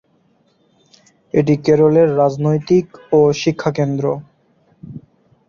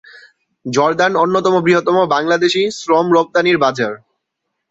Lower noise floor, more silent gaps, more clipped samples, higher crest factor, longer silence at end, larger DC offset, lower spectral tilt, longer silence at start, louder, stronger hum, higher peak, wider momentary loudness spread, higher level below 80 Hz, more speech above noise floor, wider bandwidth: second, -58 dBFS vs -75 dBFS; neither; neither; about the same, 16 dB vs 14 dB; second, 0.5 s vs 0.75 s; neither; first, -7.5 dB/octave vs -5 dB/octave; first, 1.35 s vs 0.65 s; about the same, -15 LUFS vs -14 LUFS; neither; about the same, -2 dBFS vs -2 dBFS; first, 13 LU vs 8 LU; first, -52 dBFS vs -60 dBFS; second, 44 dB vs 61 dB; second, 7.2 kHz vs 8 kHz